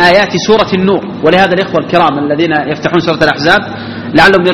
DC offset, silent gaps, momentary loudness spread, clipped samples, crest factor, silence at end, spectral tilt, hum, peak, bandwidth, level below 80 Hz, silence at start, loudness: 0.6%; none; 5 LU; 1%; 10 dB; 0 s; -5.5 dB/octave; none; 0 dBFS; 14.5 kHz; -40 dBFS; 0 s; -9 LUFS